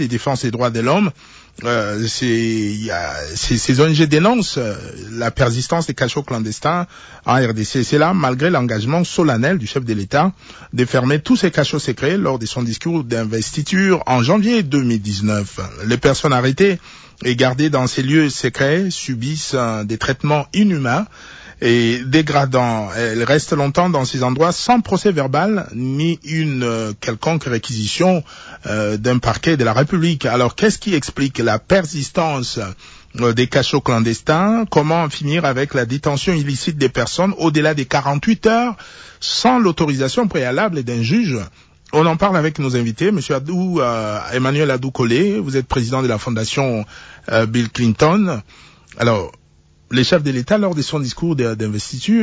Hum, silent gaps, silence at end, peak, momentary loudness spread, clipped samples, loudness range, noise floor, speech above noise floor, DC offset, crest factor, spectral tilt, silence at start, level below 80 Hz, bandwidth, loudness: none; none; 0 s; -2 dBFS; 7 LU; under 0.1%; 2 LU; -50 dBFS; 34 dB; under 0.1%; 14 dB; -5.5 dB/octave; 0 s; -42 dBFS; 8 kHz; -17 LUFS